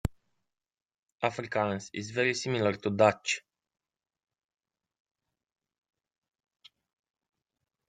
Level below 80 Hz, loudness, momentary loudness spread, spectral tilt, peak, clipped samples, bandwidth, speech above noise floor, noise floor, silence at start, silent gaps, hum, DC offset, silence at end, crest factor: -56 dBFS; -30 LUFS; 10 LU; -4.5 dB/octave; -8 dBFS; under 0.1%; 15.5 kHz; 53 dB; -82 dBFS; 0.05 s; 0.99-1.03 s, 1.12-1.16 s; none; under 0.1%; 4.5 s; 26 dB